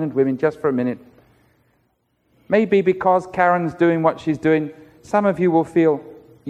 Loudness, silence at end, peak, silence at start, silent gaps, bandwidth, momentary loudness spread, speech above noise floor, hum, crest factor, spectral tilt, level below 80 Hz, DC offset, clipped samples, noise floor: -19 LUFS; 0 s; -2 dBFS; 0 s; none; 9.4 kHz; 6 LU; 48 dB; none; 16 dB; -8 dB/octave; -58 dBFS; under 0.1%; under 0.1%; -66 dBFS